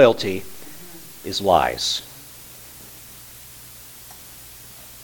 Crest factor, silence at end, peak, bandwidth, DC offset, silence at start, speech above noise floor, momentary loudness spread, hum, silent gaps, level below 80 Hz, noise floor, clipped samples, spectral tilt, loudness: 24 dB; 0 s; 0 dBFS; 19 kHz; under 0.1%; 0 s; 22 dB; 21 LU; none; none; -52 dBFS; -42 dBFS; under 0.1%; -3.5 dB/octave; -21 LUFS